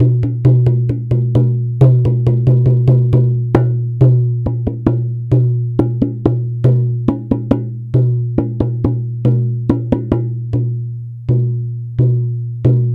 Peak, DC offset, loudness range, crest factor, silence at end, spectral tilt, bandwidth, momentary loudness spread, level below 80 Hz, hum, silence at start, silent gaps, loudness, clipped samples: 0 dBFS; under 0.1%; 5 LU; 14 dB; 0 s; -11.5 dB/octave; 3.2 kHz; 7 LU; -36 dBFS; none; 0 s; none; -15 LUFS; under 0.1%